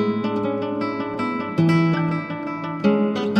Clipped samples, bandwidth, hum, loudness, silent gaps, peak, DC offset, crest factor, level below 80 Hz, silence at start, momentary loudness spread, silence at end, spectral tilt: under 0.1%; 8.2 kHz; none; -22 LUFS; none; -6 dBFS; under 0.1%; 16 dB; -60 dBFS; 0 s; 8 LU; 0 s; -8 dB/octave